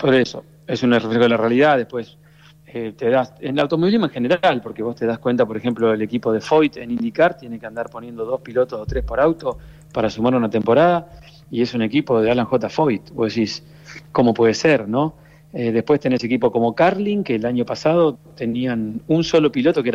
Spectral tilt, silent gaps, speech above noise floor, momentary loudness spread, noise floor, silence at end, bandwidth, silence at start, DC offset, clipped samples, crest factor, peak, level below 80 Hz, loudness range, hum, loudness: -6.5 dB/octave; none; 29 dB; 13 LU; -48 dBFS; 0 s; 8.6 kHz; 0 s; under 0.1%; under 0.1%; 14 dB; -6 dBFS; -44 dBFS; 2 LU; none; -19 LUFS